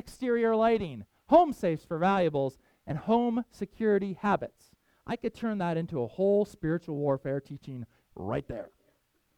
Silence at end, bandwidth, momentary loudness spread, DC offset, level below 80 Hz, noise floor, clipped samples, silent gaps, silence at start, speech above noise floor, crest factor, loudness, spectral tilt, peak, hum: 0.7 s; 14 kHz; 17 LU; under 0.1%; -58 dBFS; -71 dBFS; under 0.1%; none; 0.05 s; 43 dB; 20 dB; -29 LUFS; -8 dB/octave; -10 dBFS; none